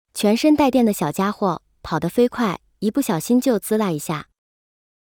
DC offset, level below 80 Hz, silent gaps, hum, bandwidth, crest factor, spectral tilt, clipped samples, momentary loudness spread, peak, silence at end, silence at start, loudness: under 0.1%; -54 dBFS; none; none; over 20 kHz; 16 dB; -5.5 dB/octave; under 0.1%; 10 LU; -4 dBFS; 0.85 s; 0.15 s; -20 LUFS